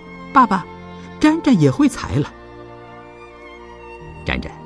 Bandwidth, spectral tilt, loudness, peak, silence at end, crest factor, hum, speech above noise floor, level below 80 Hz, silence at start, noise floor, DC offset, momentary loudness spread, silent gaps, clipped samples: 11 kHz; -6.5 dB/octave; -17 LUFS; 0 dBFS; 0 s; 20 dB; none; 23 dB; -40 dBFS; 0 s; -39 dBFS; under 0.1%; 24 LU; none; under 0.1%